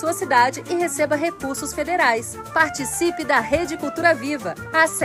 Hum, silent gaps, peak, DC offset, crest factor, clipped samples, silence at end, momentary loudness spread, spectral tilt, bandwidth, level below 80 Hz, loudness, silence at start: none; none; -4 dBFS; under 0.1%; 18 dB; under 0.1%; 0 s; 8 LU; -3 dB/octave; 16 kHz; -50 dBFS; -21 LUFS; 0 s